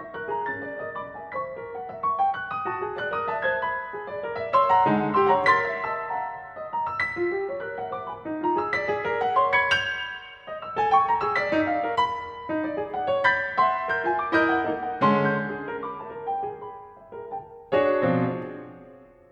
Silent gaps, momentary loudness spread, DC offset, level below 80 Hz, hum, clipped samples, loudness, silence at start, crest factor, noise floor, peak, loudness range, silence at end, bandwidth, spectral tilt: none; 14 LU; under 0.1%; -60 dBFS; none; under 0.1%; -25 LUFS; 0 s; 18 dB; -49 dBFS; -8 dBFS; 5 LU; 0.25 s; 9.4 kHz; -6 dB/octave